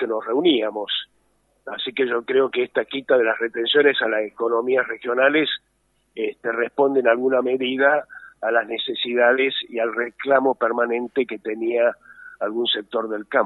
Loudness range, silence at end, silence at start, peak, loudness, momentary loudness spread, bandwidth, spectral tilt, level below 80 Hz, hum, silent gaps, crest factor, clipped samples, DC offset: 2 LU; 0 s; 0 s; -2 dBFS; -21 LUFS; 10 LU; 4.2 kHz; -6 dB/octave; -72 dBFS; none; none; 18 dB; under 0.1%; under 0.1%